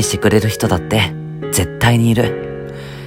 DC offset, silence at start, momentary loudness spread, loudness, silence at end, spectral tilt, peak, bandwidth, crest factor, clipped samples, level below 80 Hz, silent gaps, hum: under 0.1%; 0 s; 13 LU; -16 LUFS; 0 s; -5 dB/octave; 0 dBFS; 16.5 kHz; 16 dB; under 0.1%; -38 dBFS; none; none